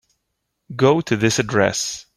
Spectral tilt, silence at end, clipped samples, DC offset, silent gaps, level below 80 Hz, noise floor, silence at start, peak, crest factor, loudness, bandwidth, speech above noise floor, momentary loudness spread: -4.5 dB/octave; 0.15 s; under 0.1%; under 0.1%; none; -54 dBFS; -75 dBFS; 0.7 s; -2 dBFS; 18 dB; -18 LUFS; 15 kHz; 57 dB; 6 LU